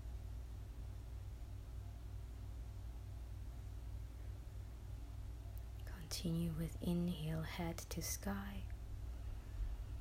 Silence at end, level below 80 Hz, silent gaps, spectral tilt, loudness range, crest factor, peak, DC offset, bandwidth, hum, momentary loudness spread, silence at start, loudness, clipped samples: 0 s; -50 dBFS; none; -5.5 dB/octave; 8 LU; 18 dB; -28 dBFS; under 0.1%; 16 kHz; none; 11 LU; 0 s; -47 LUFS; under 0.1%